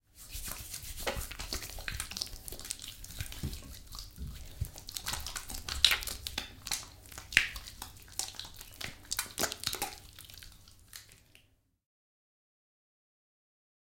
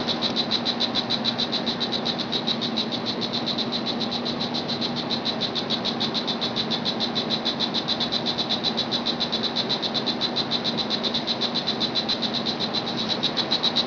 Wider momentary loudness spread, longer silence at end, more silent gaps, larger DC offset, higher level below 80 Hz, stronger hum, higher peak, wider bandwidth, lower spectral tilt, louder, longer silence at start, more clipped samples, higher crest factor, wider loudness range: first, 19 LU vs 3 LU; first, 2.45 s vs 0 s; neither; neither; first, -50 dBFS vs -58 dBFS; neither; first, -2 dBFS vs -10 dBFS; first, 17 kHz vs 5.4 kHz; second, -1 dB/octave vs -4 dB/octave; second, -36 LUFS vs -24 LUFS; first, 0.15 s vs 0 s; neither; first, 36 dB vs 16 dB; first, 9 LU vs 2 LU